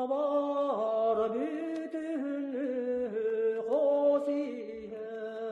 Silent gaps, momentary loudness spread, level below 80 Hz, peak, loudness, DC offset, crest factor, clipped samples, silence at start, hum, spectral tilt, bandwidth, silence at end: none; 11 LU; -74 dBFS; -18 dBFS; -32 LUFS; under 0.1%; 14 dB; under 0.1%; 0 s; none; -6.5 dB/octave; 8 kHz; 0 s